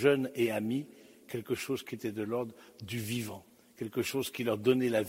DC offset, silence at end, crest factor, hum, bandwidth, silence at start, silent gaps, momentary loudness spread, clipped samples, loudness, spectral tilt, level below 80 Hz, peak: under 0.1%; 0 s; 20 dB; none; 16 kHz; 0 s; none; 14 LU; under 0.1%; -34 LUFS; -5.5 dB/octave; -72 dBFS; -12 dBFS